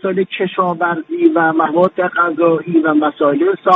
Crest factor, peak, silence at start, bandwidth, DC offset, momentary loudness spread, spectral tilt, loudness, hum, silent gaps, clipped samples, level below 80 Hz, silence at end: 14 dB; 0 dBFS; 0.05 s; 4 kHz; under 0.1%; 5 LU; -8.5 dB/octave; -15 LUFS; none; none; under 0.1%; -64 dBFS; 0 s